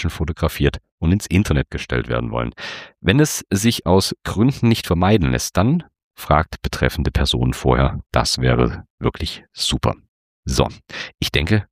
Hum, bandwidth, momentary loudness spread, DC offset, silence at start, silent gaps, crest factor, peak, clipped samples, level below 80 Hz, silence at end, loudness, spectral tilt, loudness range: none; 15.5 kHz; 8 LU; under 0.1%; 0 s; 0.91-0.98 s, 6.03-6.11 s, 8.90-8.98 s, 10.08-10.43 s; 18 dB; -2 dBFS; under 0.1%; -30 dBFS; 0.1 s; -19 LUFS; -5 dB/octave; 3 LU